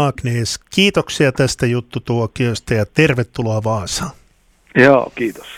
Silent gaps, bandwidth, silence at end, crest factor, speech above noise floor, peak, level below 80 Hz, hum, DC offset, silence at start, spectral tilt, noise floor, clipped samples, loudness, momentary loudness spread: none; 15.5 kHz; 0 s; 16 dB; 37 dB; 0 dBFS; -42 dBFS; none; under 0.1%; 0 s; -5 dB/octave; -53 dBFS; under 0.1%; -16 LUFS; 10 LU